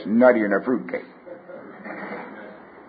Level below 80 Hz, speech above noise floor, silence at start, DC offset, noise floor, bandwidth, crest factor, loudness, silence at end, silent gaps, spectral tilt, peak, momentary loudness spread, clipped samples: -70 dBFS; 23 dB; 0 s; under 0.1%; -42 dBFS; 4.9 kHz; 20 dB; -21 LUFS; 0.3 s; none; -11.5 dB/octave; -2 dBFS; 24 LU; under 0.1%